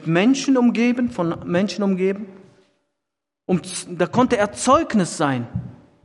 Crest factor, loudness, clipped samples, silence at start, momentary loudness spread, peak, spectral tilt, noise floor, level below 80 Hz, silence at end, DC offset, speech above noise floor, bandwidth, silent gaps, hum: 18 dB; -20 LUFS; under 0.1%; 0 s; 14 LU; -2 dBFS; -5.5 dB/octave; -83 dBFS; -54 dBFS; 0.3 s; under 0.1%; 64 dB; 11.5 kHz; none; none